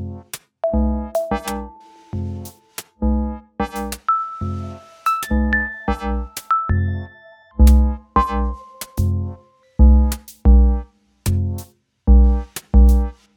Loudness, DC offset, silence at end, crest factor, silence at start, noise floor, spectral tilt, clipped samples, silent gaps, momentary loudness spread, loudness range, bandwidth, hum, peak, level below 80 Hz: -19 LUFS; under 0.1%; 0.25 s; 18 dB; 0 s; -46 dBFS; -7 dB/octave; under 0.1%; none; 17 LU; 7 LU; 16.5 kHz; none; 0 dBFS; -20 dBFS